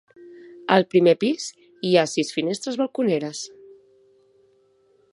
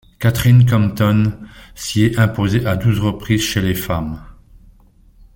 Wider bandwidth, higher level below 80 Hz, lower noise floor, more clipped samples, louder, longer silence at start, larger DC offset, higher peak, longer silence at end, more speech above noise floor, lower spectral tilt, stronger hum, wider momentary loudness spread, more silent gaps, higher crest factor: second, 11.5 kHz vs 17 kHz; second, -74 dBFS vs -38 dBFS; first, -61 dBFS vs -48 dBFS; neither; second, -22 LUFS vs -16 LUFS; about the same, 0.2 s vs 0.2 s; neither; about the same, -2 dBFS vs -2 dBFS; first, 1.65 s vs 1.05 s; first, 40 dB vs 33 dB; about the same, -5 dB/octave vs -6 dB/octave; neither; first, 16 LU vs 11 LU; neither; first, 22 dB vs 14 dB